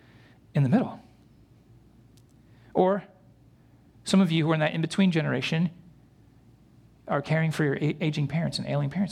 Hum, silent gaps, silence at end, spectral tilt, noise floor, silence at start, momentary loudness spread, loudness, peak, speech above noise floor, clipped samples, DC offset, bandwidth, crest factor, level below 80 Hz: none; none; 0 s; -6.5 dB/octave; -57 dBFS; 0.55 s; 8 LU; -26 LUFS; -8 dBFS; 32 dB; under 0.1%; under 0.1%; 12 kHz; 20 dB; -62 dBFS